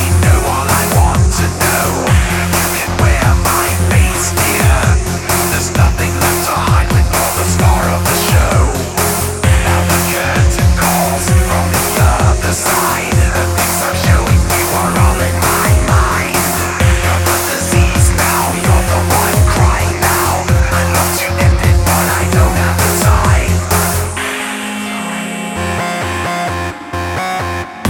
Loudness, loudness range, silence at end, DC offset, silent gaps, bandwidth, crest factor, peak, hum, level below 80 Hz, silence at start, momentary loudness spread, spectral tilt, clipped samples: -12 LUFS; 2 LU; 0 s; under 0.1%; none; 19.5 kHz; 12 dB; 0 dBFS; none; -18 dBFS; 0 s; 6 LU; -4.5 dB/octave; under 0.1%